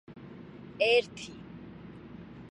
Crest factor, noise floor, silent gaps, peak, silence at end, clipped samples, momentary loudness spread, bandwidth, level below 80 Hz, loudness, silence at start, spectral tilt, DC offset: 20 dB; -47 dBFS; none; -14 dBFS; 0.1 s; under 0.1%; 22 LU; 11 kHz; -64 dBFS; -27 LUFS; 0.1 s; -4 dB/octave; under 0.1%